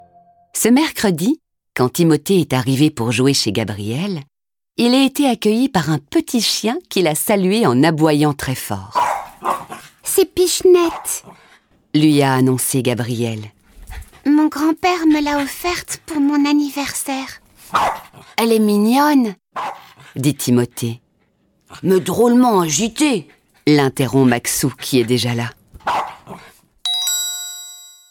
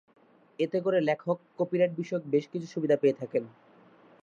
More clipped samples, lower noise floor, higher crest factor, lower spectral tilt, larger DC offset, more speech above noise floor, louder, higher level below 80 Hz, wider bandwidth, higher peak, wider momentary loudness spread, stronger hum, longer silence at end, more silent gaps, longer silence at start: neither; first, -61 dBFS vs -57 dBFS; about the same, 14 dB vs 18 dB; second, -4.5 dB/octave vs -7.5 dB/octave; neither; first, 45 dB vs 29 dB; first, -17 LUFS vs -29 LUFS; first, -50 dBFS vs -82 dBFS; first, 19 kHz vs 7.4 kHz; first, -2 dBFS vs -12 dBFS; first, 12 LU vs 8 LU; neither; second, 0.25 s vs 0.75 s; neither; about the same, 0.55 s vs 0.6 s